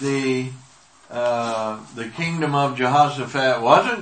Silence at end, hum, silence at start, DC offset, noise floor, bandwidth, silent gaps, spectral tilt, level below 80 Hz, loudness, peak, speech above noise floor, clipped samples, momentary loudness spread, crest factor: 0 s; none; 0 s; 0.1%; -50 dBFS; 8.8 kHz; none; -5 dB/octave; -68 dBFS; -20 LUFS; 0 dBFS; 31 dB; under 0.1%; 15 LU; 20 dB